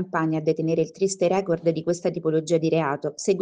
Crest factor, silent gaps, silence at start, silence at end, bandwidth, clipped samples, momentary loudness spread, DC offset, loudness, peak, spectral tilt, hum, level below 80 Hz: 14 dB; none; 0 s; 0 s; 9.8 kHz; under 0.1%; 3 LU; under 0.1%; -24 LUFS; -8 dBFS; -6 dB/octave; none; -66 dBFS